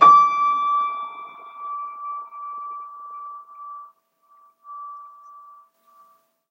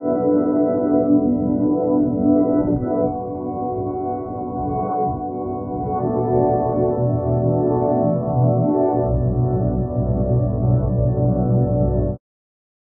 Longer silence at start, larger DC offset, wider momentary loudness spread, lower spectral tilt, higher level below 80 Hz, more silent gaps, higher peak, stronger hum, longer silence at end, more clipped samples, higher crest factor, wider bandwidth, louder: about the same, 0 s vs 0 s; neither; first, 22 LU vs 8 LU; second, -3.5 dB/octave vs -10 dB/octave; second, under -90 dBFS vs -34 dBFS; neither; first, 0 dBFS vs -6 dBFS; neither; first, 1.45 s vs 0.85 s; neither; first, 22 dB vs 14 dB; first, 6.4 kHz vs 2.3 kHz; about the same, -21 LUFS vs -20 LUFS